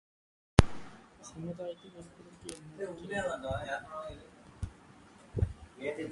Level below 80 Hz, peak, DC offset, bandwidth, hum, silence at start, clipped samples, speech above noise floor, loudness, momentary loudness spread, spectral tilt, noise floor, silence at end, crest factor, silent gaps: -44 dBFS; 0 dBFS; under 0.1%; 11.5 kHz; none; 0.6 s; under 0.1%; 17 dB; -36 LUFS; 25 LU; -6 dB/octave; -57 dBFS; 0 s; 36 dB; none